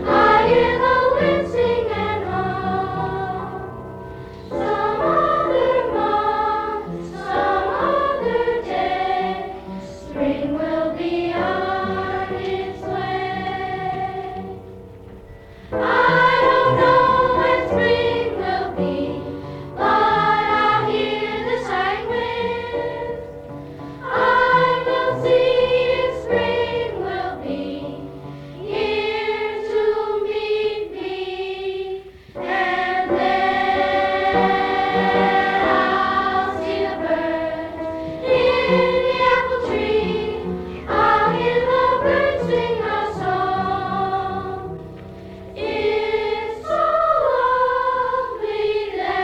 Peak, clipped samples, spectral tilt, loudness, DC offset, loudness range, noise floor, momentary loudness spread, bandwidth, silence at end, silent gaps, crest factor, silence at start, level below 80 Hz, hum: -4 dBFS; under 0.1%; -6.5 dB/octave; -20 LUFS; under 0.1%; 6 LU; -40 dBFS; 14 LU; 9 kHz; 0 s; none; 16 dB; 0 s; -44 dBFS; none